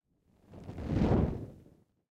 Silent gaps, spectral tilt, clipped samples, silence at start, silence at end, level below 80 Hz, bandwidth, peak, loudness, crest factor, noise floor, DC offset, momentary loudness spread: none; -9.5 dB/octave; under 0.1%; 0.5 s; 0.5 s; -44 dBFS; 8.4 kHz; -16 dBFS; -32 LUFS; 20 dB; -67 dBFS; under 0.1%; 20 LU